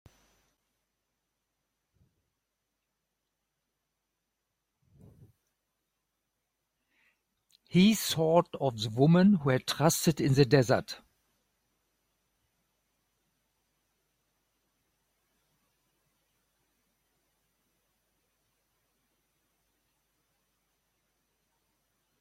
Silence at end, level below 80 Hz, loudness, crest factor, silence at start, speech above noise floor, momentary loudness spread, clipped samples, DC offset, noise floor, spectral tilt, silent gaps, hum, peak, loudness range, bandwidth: 11.25 s; -66 dBFS; -26 LUFS; 24 dB; 7.75 s; 59 dB; 9 LU; under 0.1%; under 0.1%; -84 dBFS; -5.5 dB/octave; none; none; -8 dBFS; 7 LU; 16.5 kHz